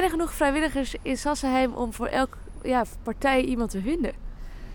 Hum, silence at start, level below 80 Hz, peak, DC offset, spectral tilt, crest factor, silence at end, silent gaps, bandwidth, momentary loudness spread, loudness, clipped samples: none; 0 s; -38 dBFS; -8 dBFS; under 0.1%; -4.5 dB/octave; 18 dB; 0 s; none; 19 kHz; 9 LU; -26 LUFS; under 0.1%